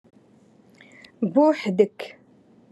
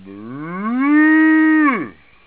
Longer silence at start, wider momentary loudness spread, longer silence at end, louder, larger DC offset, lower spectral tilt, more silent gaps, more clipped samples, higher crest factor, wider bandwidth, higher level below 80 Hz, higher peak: first, 1.2 s vs 0.05 s; about the same, 19 LU vs 19 LU; first, 0.6 s vs 0.35 s; second, -22 LUFS vs -14 LUFS; second, under 0.1% vs 0.2%; second, -7.5 dB/octave vs -9.5 dB/octave; neither; neither; first, 20 dB vs 12 dB; first, 11.5 kHz vs 4 kHz; second, -80 dBFS vs -62 dBFS; about the same, -4 dBFS vs -4 dBFS